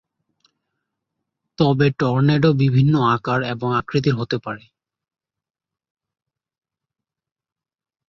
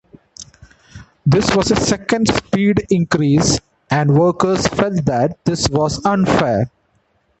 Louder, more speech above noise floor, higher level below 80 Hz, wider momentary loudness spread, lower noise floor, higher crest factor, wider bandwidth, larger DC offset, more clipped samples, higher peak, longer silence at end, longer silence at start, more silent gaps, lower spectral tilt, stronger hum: second, -19 LUFS vs -16 LUFS; first, 71 dB vs 46 dB; second, -54 dBFS vs -38 dBFS; about the same, 9 LU vs 7 LU; first, -88 dBFS vs -61 dBFS; about the same, 18 dB vs 16 dB; second, 6.2 kHz vs 8.8 kHz; neither; neither; second, -4 dBFS vs 0 dBFS; first, 3.5 s vs 0.75 s; first, 1.6 s vs 0.4 s; neither; first, -8.5 dB/octave vs -5.5 dB/octave; neither